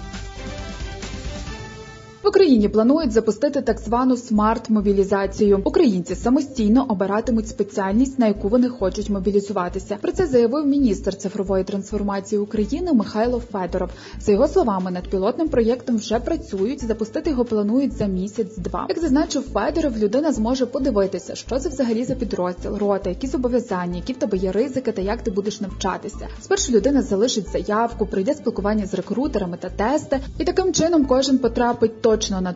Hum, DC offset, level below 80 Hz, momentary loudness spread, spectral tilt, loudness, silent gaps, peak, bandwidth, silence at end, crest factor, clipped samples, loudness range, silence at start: none; under 0.1%; -38 dBFS; 9 LU; -5.5 dB/octave; -21 LUFS; none; -4 dBFS; 7.8 kHz; 0 s; 16 dB; under 0.1%; 4 LU; 0 s